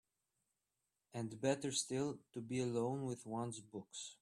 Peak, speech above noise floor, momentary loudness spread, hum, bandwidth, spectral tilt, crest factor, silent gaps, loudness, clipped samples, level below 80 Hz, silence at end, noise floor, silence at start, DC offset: -22 dBFS; 47 dB; 11 LU; none; 13 kHz; -4.5 dB/octave; 22 dB; none; -42 LUFS; under 0.1%; -80 dBFS; 0.05 s; -89 dBFS; 1.15 s; under 0.1%